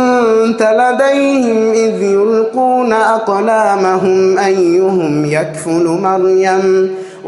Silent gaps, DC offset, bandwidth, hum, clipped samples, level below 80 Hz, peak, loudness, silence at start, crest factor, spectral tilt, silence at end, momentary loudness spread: none; under 0.1%; 11.5 kHz; none; under 0.1%; -58 dBFS; 0 dBFS; -11 LUFS; 0 s; 10 dB; -5.5 dB/octave; 0 s; 3 LU